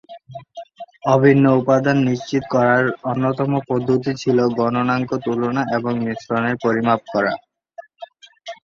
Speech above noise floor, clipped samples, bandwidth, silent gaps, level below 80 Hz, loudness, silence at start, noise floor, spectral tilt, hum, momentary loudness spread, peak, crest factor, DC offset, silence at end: 25 dB; under 0.1%; 7.2 kHz; none; -58 dBFS; -18 LUFS; 0.1 s; -42 dBFS; -7.5 dB/octave; none; 22 LU; 0 dBFS; 18 dB; under 0.1%; 0.1 s